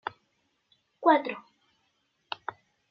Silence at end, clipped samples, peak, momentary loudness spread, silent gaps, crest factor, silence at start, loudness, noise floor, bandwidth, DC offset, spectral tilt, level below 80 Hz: 1.5 s; under 0.1%; -8 dBFS; 18 LU; none; 24 dB; 0.05 s; -28 LUFS; -74 dBFS; 6.2 kHz; under 0.1%; -1.5 dB/octave; -84 dBFS